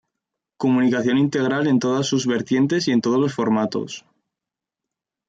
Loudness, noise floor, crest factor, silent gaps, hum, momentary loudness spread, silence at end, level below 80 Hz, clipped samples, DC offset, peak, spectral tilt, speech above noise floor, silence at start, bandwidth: -20 LUFS; -87 dBFS; 12 dB; none; none; 7 LU; 1.3 s; -66 dBFS; under 0.1%; under 0.1%; -8 dBFS; -5.5 dB/octave; 68 dB; 0.6 s; 7.8 kHz